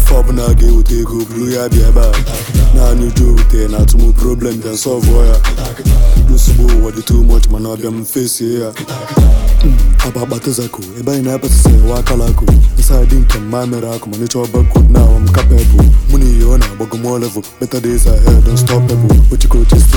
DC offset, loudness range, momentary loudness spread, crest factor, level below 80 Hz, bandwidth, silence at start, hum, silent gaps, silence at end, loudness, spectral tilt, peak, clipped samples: under 0.1%; 3 LU; 9 LU; 8 dB; -8 dBFS; 18.5 kHz; 0 s; none; none; 0 s; -12 LUFS; -6 dB/octave; 0 dBFS; under 0.1%